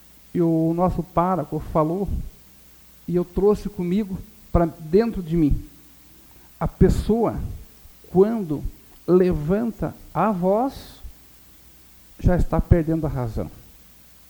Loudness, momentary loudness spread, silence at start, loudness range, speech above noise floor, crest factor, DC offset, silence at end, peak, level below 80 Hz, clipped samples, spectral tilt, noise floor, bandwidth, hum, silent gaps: -22 LUFS; 14 LU; 0.35 s; 3 LU; 28 dB; 22 dB; under 0.1%; 0.7 s; 0 dBFS; -32 dBFS; under 0.1%; -9 dB/octave; -49 dBFS; over 20 kHz; none; none